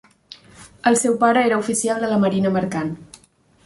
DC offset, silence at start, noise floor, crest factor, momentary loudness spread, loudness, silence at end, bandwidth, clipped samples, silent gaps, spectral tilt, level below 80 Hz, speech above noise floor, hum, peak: under 0.1%; 0.6 s; -55 dBFS; 16 dB; 10 LU; -19 LUFS; 0.6 s; 12 kHz; under 0.1%; none; -4.5 dB/octave; -58 dBFS; 36 dB; none; -4 dBFS